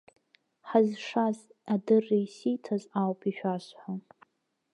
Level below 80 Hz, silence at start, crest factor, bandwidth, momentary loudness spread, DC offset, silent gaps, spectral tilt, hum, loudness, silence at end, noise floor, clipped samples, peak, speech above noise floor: -86 dBFS; 0.65 s; 20 dB; 10.5 kHz; 14 LU; under 0.1%; none; -7.5 dB/octave; none; -30 LUFS; 0.75 s; -76 dBFS; under 0.1%; -10 dBFS; 47 dB